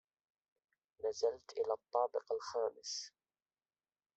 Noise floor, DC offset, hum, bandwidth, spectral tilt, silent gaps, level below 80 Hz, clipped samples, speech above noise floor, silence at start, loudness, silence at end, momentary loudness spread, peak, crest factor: under -90 dBFS; under 0.1%; none; 8.2 kHz; -1 dB/octave; none; -84 dBFS; under 0.1%; over 51 dB; 1 s; -40 LUFS; 1.1 s; 7 LU; -20 dBFS; 20 dB